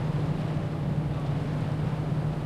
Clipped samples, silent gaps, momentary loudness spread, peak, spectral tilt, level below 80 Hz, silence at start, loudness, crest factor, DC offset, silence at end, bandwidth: under 0.1%; none; 1 LU; -18 dBFS; -8.5 dB/octave; -44 dBFS; 0 s; -30 LUFS; 10 dB; under 0.1%; 0 s; 9.4 kHz